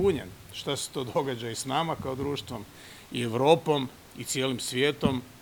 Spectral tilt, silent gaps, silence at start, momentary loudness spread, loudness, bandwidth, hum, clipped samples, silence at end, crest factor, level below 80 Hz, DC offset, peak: -4.5 dB/octave; none; 0 s; 17 LU; -29 LUFS; over 20 kHz; none; under 0.1%; 0 s; 22 dB; -56 dBFS; under 0.1%; -6 dBFS